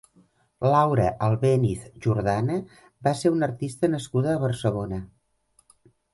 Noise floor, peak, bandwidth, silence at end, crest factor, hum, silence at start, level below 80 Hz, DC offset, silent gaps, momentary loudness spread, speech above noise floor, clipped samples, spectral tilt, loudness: -66 dBFS; -6 dBFS; 11.5 kHz; 1.1 s; 18 dB; none; 0.6 s; -50 dBFS; under 0.1%; none; 8 LU; 42 dB; under 0.1%; -7.5 dB/octave; -24 LUFS